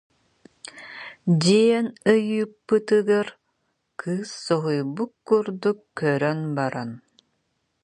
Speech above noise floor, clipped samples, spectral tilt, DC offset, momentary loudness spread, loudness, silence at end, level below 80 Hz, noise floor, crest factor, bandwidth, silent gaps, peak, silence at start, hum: 51 dB; under 0.1%; -6 dB/octave; under 0.1%; 19 LU; -23 LUFS; 0.85 s; -70 dBFS; -73 dBFS; 18 dB; 10.5 kHz; none; -6 dBFS; 0.75 s; none